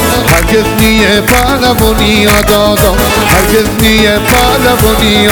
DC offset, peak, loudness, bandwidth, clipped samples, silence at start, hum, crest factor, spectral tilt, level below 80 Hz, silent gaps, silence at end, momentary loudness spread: 0.6%; 0 dBFS; -7 LUFS; over 20 kHz; 0.6%; 0 s; none; 8 dB; -4 dB/octave; -18 dBFS; none; 0 s; 2 LU